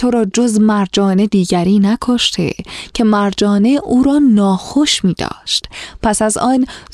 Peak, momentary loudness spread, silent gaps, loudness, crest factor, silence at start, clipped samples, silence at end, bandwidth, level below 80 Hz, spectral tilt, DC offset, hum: -2 dBFS; 7 LU; none; -13 LUFS; 12 dB; 0 s; under 0.1%; 0.15 s; 12.5 kHz; -40 dBFS; -5 dB/octave; under 0.1%; none